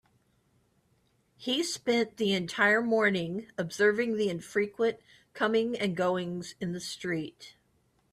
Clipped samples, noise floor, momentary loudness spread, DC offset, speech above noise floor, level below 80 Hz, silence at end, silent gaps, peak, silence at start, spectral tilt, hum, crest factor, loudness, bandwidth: under 0.1%; -70 dBFS; 12 LU; under 0.1%; 41 dB; -72 dBFS; 0.6 s; none; -12 dBFS; 1.4 s; -4.5 dB/octave; none; 18 dB; -29 LUFS; 13.5 kHz